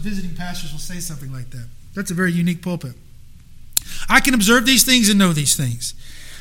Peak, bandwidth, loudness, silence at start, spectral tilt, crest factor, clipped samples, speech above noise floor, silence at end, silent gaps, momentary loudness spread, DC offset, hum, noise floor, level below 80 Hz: 0 dBFS; 17 kHz; -16 LUFS; 0 s; -3 dB/octave; 20 dB; under 0.1%; 21 dB; 0 s; none; 21 LU; under 0.1%; none; -39 dBFS; -34 dBFS